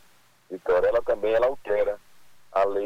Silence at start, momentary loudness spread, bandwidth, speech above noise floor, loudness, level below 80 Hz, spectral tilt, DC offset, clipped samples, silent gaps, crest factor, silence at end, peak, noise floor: 0.5 s; 12 LU; 18 kHz; 36 dB; -25 LUFS; -52 dBFS; -5.5 dB/octave; under 0.1%; under 0.1%; none; 14 dB; 0 s; -12 dBFS; -60 dBFS